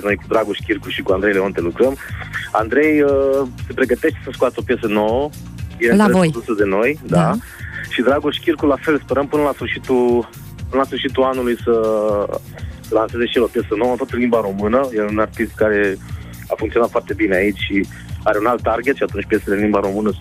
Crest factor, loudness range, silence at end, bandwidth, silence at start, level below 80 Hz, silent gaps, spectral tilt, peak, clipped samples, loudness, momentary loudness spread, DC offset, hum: 14 dB; 2 LU; 0 s; 15.5 kHz; 0 s; -40 dBFS; none; -6.5 dB/octave; -2 dBFS; under 0.1%; -18 LUFS; 9 LU; under 0.1%; none